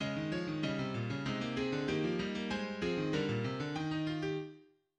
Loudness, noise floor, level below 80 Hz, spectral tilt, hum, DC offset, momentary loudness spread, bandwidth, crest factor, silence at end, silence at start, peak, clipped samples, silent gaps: -36 LUFS; -58 dBFS; -62 dBFS; -6.5 dB/octave; none; under 0.1%; 3 LU; 9.6 kHz; 16 dB; 0.35 s; 0 s; -22 dBFS; under 0.1%; none